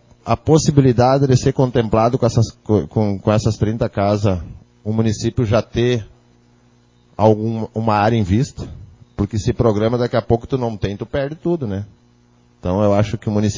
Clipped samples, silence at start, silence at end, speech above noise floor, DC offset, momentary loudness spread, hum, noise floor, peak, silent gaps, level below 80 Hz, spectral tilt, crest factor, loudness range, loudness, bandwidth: under 0.1%; 0.25 s; 0 s; 37 dB; under 0.1%; 11 LU; 60 Hz at -40 dBFS; -53 dBFS; 0 dBFS; none; -36 dBFS; -7 dB/octave; 18 dB; 5 LU; -18 LUFS; 7.6 kHz